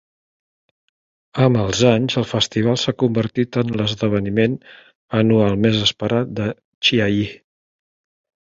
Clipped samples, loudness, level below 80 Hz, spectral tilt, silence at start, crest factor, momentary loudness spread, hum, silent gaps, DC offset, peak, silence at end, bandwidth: under 0.1%; -18 LUFS; -48 dBFS; -5.5 dB/octave; 1.35 s; 18 dB; 8 LU; none; 4.95-5.08 s, 6.65-6.81 s; under 0.1%; -2 dBFS; 1.1 s; 7.8 kHz